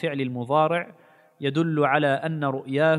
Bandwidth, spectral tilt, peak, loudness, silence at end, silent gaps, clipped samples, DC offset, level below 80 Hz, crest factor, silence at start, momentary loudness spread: 11 kHz; -7.5 dB/octave; -4 dBFS; -24 LUFS; 0 s; none; under 0.1%; under 0.1%; -72 dBFS; 18 dB; 0 s; 8 LU